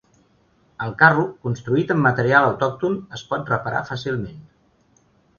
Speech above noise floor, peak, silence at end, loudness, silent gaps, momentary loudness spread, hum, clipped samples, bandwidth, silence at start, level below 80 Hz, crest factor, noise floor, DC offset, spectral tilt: 39 dB; 0 dBFS; 1 s; -20 LUFS; none; 14 LU; none; under 0.1%; 7.2 kHz; 0.8 s; -56 dBFS; 22 dB; -60 dBFS; under 0.1%; -7 dB/octave